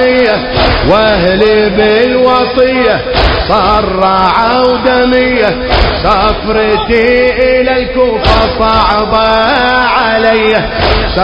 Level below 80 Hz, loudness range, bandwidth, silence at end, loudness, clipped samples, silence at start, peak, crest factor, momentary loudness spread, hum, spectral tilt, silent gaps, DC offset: -20 dBFS; 1 LU; 8 kHz; 0 s; -8 LUFS; 0.5%; 0 s; 0 dBFS; 8 dB; 2 LU; none; -7 dB/octave; none; under 0.1%